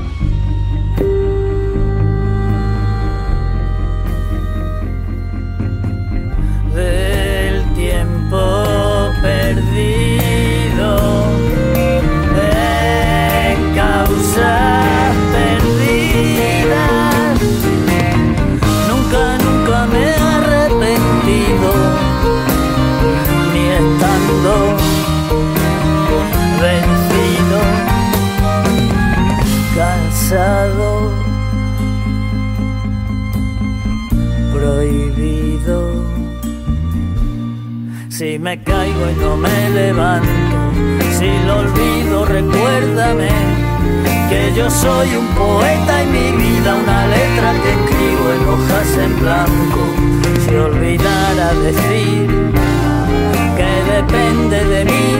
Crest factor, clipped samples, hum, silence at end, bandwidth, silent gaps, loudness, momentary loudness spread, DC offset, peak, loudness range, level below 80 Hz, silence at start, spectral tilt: 12 dB; under 0.1%; none; 0 s; 16.5 kHz; none; -14 LUFS; 7 LU; under 0.1%; 0 dBFS; 5 LU; -20 dBFS; 0 s; -6 dB/octave